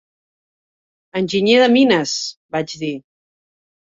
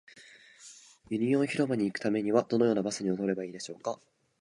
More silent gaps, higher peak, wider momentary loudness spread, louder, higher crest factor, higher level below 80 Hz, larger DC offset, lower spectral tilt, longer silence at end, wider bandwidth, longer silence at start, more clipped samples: first, 2.37-2.49 s vs none; first, -2 dBFS vs -10 dBFS; second, 14 LU vs 20 LU; first, -17 LUFS vs -30 LUFS; about the same, 18 dB vs 20 dB; first, -62 dBFS vs -72 dBFS; neither; second, -4 dB/octave vs -6 dB/octave; first, 1 s vs 0.45 s; second, 7.8 kHz vs 11.5 kHz; first, 1.15 s vs 0.15 s; neither